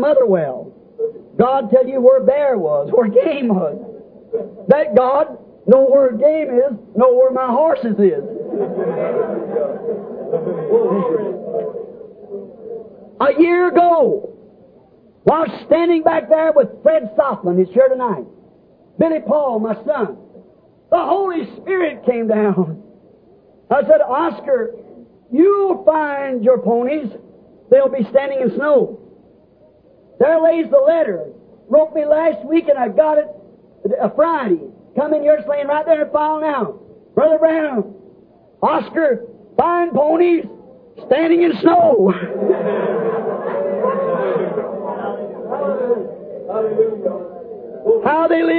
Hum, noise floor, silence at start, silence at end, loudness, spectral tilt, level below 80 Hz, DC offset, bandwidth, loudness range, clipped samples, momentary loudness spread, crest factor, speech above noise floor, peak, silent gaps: none; -50 dBFS; 0 s; 0 s; -16 LUFS; -11 dB/octave; -60 dBFS; under 0.1%; 4.8 kHz; 5 LU; under 0.1%; 13 LU; 16 dB; 35 dB; 0 dBFS; none